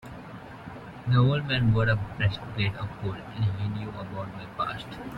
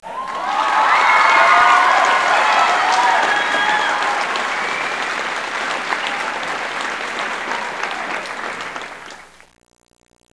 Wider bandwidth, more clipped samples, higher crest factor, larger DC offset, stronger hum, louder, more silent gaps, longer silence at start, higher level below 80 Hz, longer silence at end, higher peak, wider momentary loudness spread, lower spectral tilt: second, 5.6 kHz vs 11 kHz; neither; about the same, 18 dB vs 18 dB; second, under 0.1% vs 0.2%; neither; second, -28 LUFS vs -16 LUFS; neither; about the same, 0 s vs 0 s; first, -50 dBFS vs -60 dBFS; second, 0 s vs 1.15 s; second, -10 dBFS vs 0 dBFS; first, 19 LU vs 14 LU; first, -8 dB/octave vs -1 dB/octave